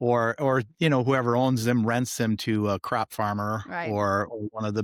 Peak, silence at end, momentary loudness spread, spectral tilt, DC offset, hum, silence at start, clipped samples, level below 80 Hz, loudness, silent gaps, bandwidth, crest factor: -10 dBFS; 0 s; 7 LU; -6 dB/octave; under 0.1%; none; 0 s; under 0.1%; -62 dBFS; -26 LUFS; none; 17.5 kHz; 14 dB